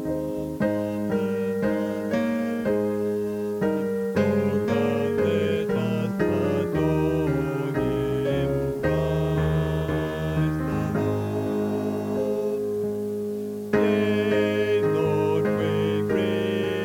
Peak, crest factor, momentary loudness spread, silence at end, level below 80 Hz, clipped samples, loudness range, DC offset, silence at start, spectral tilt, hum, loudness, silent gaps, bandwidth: -8 dBFS; 16 dB; 4 LU; 0 s; -44 dBFS; under 0.1%; 2 LU; under 0.1%; 0 s; -7.5 dB/octave; none; -25 LUFS; none; 17.5 kHz